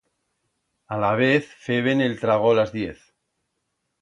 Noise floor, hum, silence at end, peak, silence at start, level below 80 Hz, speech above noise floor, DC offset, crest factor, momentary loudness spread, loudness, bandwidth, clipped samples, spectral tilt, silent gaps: -76 dBFS; none; 1.1 s; -6 dBFS; 0.9 s; -58 dBFS; 55 dB; under 0.1%; 18 dB; 11 LU; -22 LUFS; 10.5 kHz; under 0.1%; -7 dB/octave; none